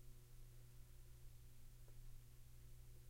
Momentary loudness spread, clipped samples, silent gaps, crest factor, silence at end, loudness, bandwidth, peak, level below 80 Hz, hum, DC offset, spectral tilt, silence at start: 1 LU; under 0.1%; none; 12 dB; 0 s; -65 LUFS; 16 kHz; -48 dBFS; -62 dBFS; none; under 0.1%; -4.5 dB/octave; 0 s